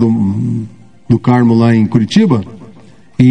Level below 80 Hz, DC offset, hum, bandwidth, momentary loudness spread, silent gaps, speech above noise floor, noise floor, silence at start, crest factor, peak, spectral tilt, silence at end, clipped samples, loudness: -44 dBFS; 0.9%; none; 9.6 kHz; 16 LU; none; 31 dB; -41 dBFS; 0 s; 12 dB; 0 dBFS; -8 dB/octave; 0 s; 0.4%; -12 LUFS